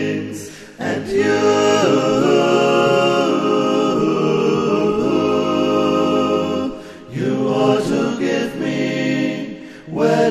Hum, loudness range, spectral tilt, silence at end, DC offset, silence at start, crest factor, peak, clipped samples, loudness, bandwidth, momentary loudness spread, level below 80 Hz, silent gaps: none; 4 LU; -5.5 dB/octave; 0 s; under 0.1%; 0 s; 16 dB; -2 dBFS; under 0.1%; -17 LUFS; 13 kHz; 13 LU; -52 dBFS; none